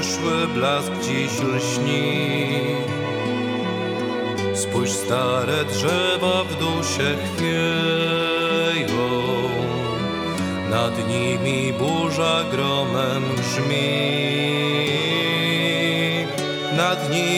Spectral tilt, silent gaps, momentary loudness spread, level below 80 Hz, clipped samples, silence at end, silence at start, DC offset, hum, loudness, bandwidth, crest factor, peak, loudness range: -4.5 dB/octave; none; 5 LU; -56 dBFS; under 0.1%; 0 s; 0 s; under 0.1%; none; -21 LUFS; 18.5 kHz; 16 dB; -6 dBFS; 2 LU